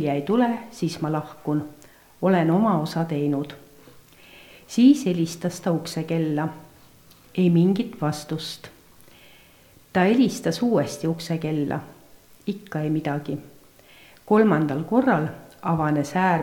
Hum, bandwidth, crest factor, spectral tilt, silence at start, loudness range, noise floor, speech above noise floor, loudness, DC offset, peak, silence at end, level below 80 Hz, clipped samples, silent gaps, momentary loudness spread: none; 19 kHz; 18 dB; -6.5 dB/octave; 0 s; 3 LU; -53 dBFS; 31 dB; -23 LUFS; under 0.1%; -6 dBFS; 0 s; -62 dBFS; under 0.1%; none; 13 LU